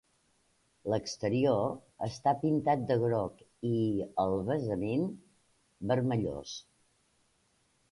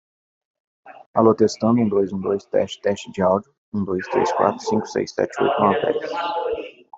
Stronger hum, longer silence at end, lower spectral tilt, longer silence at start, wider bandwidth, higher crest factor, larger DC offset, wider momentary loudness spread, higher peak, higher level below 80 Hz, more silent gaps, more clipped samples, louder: neither; first, 1.3 s vs 0 s; about the same, -7 dB/octave vs -6 dB/octave; about the same, 0.85 s vs 0.85 s; first, 11.5 kHz vs 8 kHz; about the same, 18 dB vs 20 dB; neither; first, 12 LU vs 7 LU; second, -16 dBFS vs -2 dBFS; about the same, -62 dBFS vs -62 dBFS; second, none vs 1.06-1.14 s, 3.58-3.72 s; neither; second, -32 LUFS vs -21 LUFS